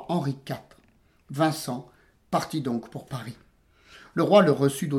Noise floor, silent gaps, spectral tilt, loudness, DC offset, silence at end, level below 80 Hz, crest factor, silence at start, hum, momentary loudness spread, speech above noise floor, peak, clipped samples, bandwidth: -62 dBFS; none; -6 dB/octave; -25 LUFS; under 0.1%; 0 s; -64 dBFS; 20 dB; 0 s; none; 19 LU; 37 dB; -6 dBFS; under 0.1%; 17 kHz